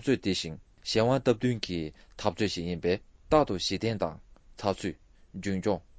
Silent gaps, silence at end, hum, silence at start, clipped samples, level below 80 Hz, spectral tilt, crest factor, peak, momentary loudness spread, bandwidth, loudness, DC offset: none; 0.2 s; none; 0 s; under 0.1%; -50 dBFS; -5.5 dB/octave; 22 dB; -8 dBFS; 12 LU; 8 kHz; -30 LUFS; under 0.1%